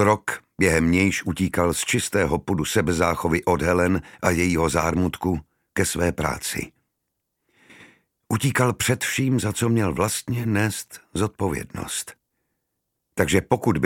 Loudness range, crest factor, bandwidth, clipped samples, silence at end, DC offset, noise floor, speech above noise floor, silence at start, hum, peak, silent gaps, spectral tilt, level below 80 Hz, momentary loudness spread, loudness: 5 LU; 22 dB; 17 kHz; under 0.1%; 0 s; under 0.1%; -78 dBFS; 56 dB; 0 s; none; -2 dBFS; none; -5 dB/octave; -46 dBFS; 9 LU; -23 LUFS